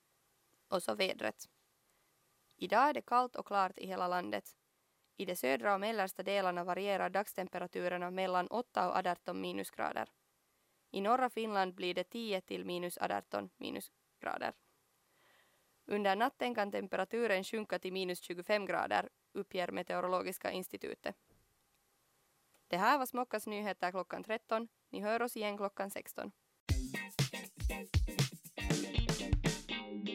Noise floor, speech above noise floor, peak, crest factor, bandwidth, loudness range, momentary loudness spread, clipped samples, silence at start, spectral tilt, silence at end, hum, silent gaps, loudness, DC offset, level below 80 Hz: -78 dBFS; 41 dB; -16 dBFS; 22 dB; 16 kHz; 4 LU; 10 LU; under 0.1%; 0.7 s; -4.5 dB/octave; 0 s; none; 26.60-26.67 s; -37 LUFS; under 0.1%; -52 dBFS